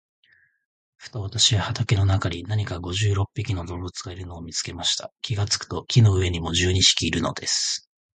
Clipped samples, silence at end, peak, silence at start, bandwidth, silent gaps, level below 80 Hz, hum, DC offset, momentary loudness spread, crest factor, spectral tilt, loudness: under 0.1%; 0.4 s; -2 dBFS; 1 s; 9.6 kHz; 5.12-5.16 s; -38 dBFS; none; under 0.1%; 15 LU; 22 dB; -3.5 dB/octave; -23 LUFS